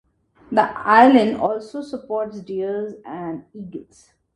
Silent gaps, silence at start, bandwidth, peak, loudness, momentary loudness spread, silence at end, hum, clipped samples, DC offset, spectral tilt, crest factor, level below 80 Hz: none; 0.5 s; 10.5 kHz; 0 dBFS; -18 LUFS; 22 LU; 0.55 s; none; under 0.1%; under 0.1%; -6.5 dB/octave; 20 dB; -60 dBFS